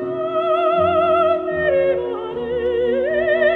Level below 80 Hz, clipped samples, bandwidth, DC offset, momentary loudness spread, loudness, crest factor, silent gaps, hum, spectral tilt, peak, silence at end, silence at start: -48 dBFS; under 0.1%; 4.3 kHz; under 0.1%; 7 LU; -18 LUFS; 12 dB; none; none; -7.5 dB/octave; -6 dBFS; 0 s; 0 s